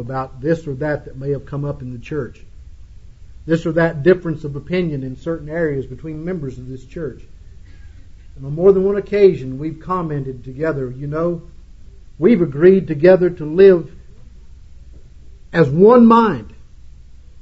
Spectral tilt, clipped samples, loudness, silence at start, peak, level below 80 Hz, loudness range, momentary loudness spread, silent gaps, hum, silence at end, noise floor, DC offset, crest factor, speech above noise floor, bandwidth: -9 dB/octave; under 0.1%; -16 LUFS; 0 s; 0 dBFS; -40 dBFS; 10 LU; 18 LU; none; none; 0 s; -39 dBFS; under 0.1%; 18 dB; 23 dB; 7.4 kHz